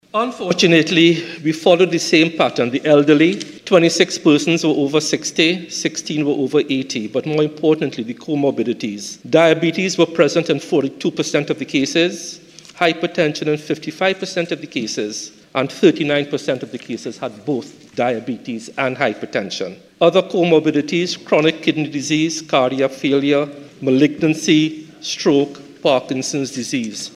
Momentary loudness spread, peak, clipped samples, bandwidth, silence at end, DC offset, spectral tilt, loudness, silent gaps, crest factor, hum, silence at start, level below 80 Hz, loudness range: 11 LU; 0 dBFS; under 0.1%; 13 kHz; 0.05 s; under 0.1%; -4.5 dB/octave; -17 LUFS; none; 18 dB; none; 0.15 s; -62 dBFS; 6 LU